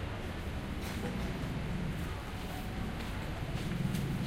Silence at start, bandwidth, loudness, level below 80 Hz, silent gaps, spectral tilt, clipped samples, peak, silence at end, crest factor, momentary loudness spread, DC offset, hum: 0 s; 16 kHz; -38 LUFS; -44 dBFS; none; -6 dB/octave; under 0.1%; -22 dBFS; 0 s; 14 dB; 5 LU; under 0.1%; none